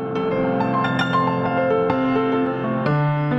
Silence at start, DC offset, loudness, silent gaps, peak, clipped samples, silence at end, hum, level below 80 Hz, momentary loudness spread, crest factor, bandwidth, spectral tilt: 0 s; under 0.1%; -20 LUFS; none; -6 dBFS; under 0.1%; 0 s; none; -50 dBFS; 2 LU; 14 dB; 8 kHz; -8.5 dB/octave